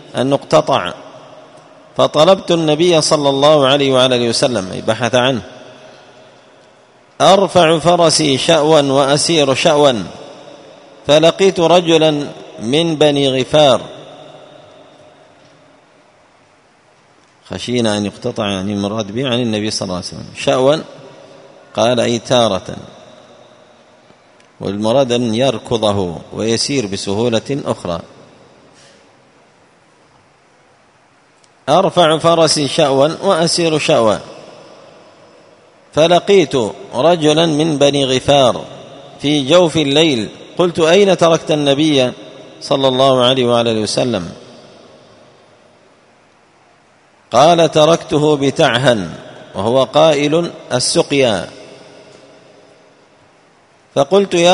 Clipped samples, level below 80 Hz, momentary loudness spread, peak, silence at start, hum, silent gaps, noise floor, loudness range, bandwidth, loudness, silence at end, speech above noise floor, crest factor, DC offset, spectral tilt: under 0.1%; -52 dBFS; 13 LU; 0 dBFS; 0.15 s; none; none; -51 dBFS; 8 LU; 11 kHz; -13 LUFS; 0 s; 38 dB; 14 dB; under 0.1%; -4.5 dB/octave